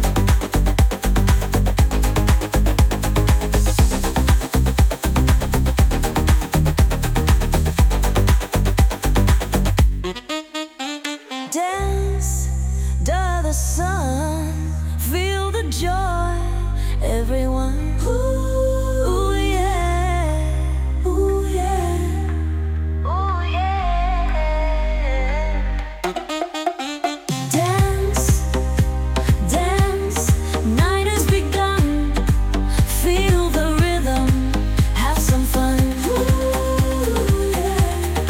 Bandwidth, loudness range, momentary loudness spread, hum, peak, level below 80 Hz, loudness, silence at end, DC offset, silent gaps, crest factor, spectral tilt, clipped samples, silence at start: 18 kHz; 4 LU; 6 LU; none; -4 dBFS; -20 dBFS; -20 LUFS; 0 s; under 0.1%; none; 14 dB; -5.5 dB/octave; under 0.1%; 0 s